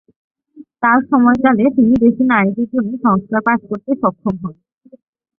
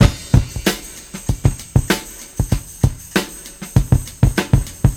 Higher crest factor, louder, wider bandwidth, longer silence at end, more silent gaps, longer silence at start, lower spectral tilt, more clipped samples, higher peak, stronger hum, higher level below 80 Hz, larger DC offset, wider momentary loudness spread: about the same, 14 dB vs 18 dB; first, -14 LUFS vs -19 LUFS; second, 3.7 kHz vs 18 kHz; first, 0.9 s vs 0 s; neither; first, 0.55 s vs 0 s; first, -9.5 dB/octave vs -5.5 dB/octave; neither; about the same, -2 dBFS vs 0 dBFS; neither; second, -50 dBFS vs -24 dBFS; neither; about the same, 10 LU vs 11 LU